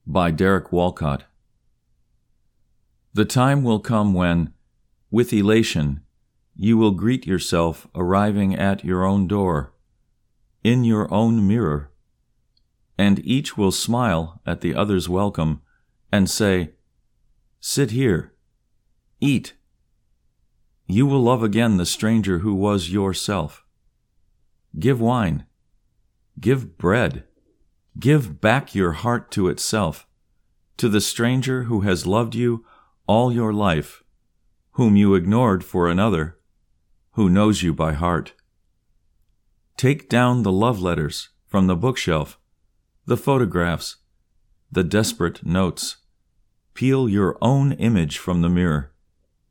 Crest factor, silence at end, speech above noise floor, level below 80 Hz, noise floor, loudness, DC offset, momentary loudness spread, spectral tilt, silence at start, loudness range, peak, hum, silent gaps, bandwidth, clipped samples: 20 dB; 0.65 s; 47 dB; -44 dBFS; -66 dBFS; -20 LUFS; under 0.1%; 9 LU; -6 dB/octave; 0.05 s; 4 LU; -2 dBFS; none; none; 18.5 kHz; under 0.1%